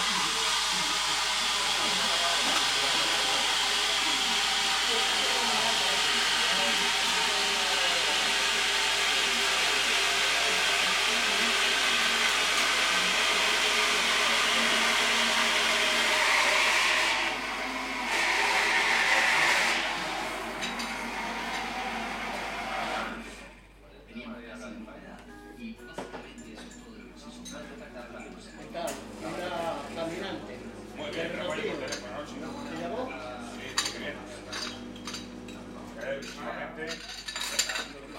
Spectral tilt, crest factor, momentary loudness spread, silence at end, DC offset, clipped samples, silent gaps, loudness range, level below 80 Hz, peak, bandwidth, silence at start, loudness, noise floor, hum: 0 dB/octave; 18 dB; 19 LU; 0 s; under 0.1%; under 0.1%; none; 17 LU; -56 dBFS; -10 dBFS; 16.5 kHz; 0 s; -25 LUFS; -52 dBFS; none